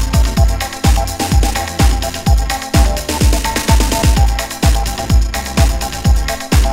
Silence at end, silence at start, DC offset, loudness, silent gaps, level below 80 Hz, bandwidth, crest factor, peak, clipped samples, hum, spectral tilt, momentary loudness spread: 0 s; 0 s; under 0.1%; -15 LUFS; none; -14 dBFS; 16.5 kHz; 12 dB; 0 dBFS; under 0.1%; none; -4.5 dB/octave; 3 LU